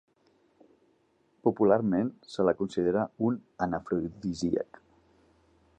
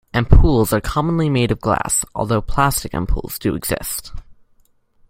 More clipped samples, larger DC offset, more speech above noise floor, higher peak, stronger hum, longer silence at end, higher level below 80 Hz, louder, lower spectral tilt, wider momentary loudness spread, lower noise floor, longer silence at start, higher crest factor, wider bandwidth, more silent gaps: neither; neither; about the same, 40 dB vs 39 dB; second, -10 dBFS vs 0 dBFS; neither; first, 1.15 s vs 0.9 s; second, -60 dBFS vs -24 dBFS; second, -29 LUFS vs -18 LUFS; first, -7.5 dB/octave vs -5 dB/octave; about the same, 9 LU vs 9 LU; first, -69 dBFS vs -56 dBFS; first, 1.45 s vs 0.15 s; about the same, 20 dB vs 16 dB; second, 9.2 kHz vs 16.5 kHz; neither